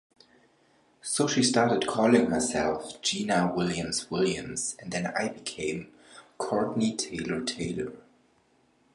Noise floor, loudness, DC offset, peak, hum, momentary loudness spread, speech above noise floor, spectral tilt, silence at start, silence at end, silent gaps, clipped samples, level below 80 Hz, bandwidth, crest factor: -66 dBFS; -28 LUFS; under 0.1%; -8 dBFS; none; 10 LU; 38 dB; -4 dB/octave; 1.05 s; 0.95 s; none; under 0.1%; -58 dBFS; 11.5 kHz; 22 dB